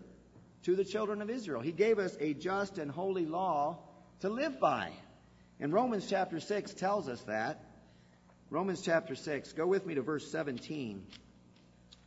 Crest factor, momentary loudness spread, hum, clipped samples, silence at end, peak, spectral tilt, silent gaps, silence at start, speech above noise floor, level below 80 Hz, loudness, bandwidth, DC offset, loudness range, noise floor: 20 dB; 9 LU; 60 Hz at -65 dBFS; under 0.1%; 0.15 s; -14 dBFS; -4.5 dB/octave; none; 0 s; 28 dB; -70 dBFS; -35 LUFS; 7.6 kHz; under 0.1%; 2 LU; -62 dBFS